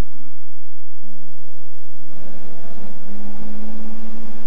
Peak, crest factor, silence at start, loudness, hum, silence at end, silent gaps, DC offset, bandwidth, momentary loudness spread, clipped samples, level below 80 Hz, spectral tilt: -6 dBFS; 16 dB; 0 s; -38 LUFS; none; 0 s; none; 50%; 11.5 kHz; 16 LU; under 0.1%; -54 dBFS; -8 dB/octave